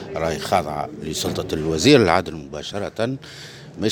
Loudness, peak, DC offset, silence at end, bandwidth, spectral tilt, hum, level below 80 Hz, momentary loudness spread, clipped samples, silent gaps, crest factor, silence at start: -21 LUFS; 0 dBFS; under 0.1%; 0 s; over 20 kHz; -4.5 dB/octave; none; -46 dBFS; 17 LU; under 0.1%; none; 20 dB; 0 s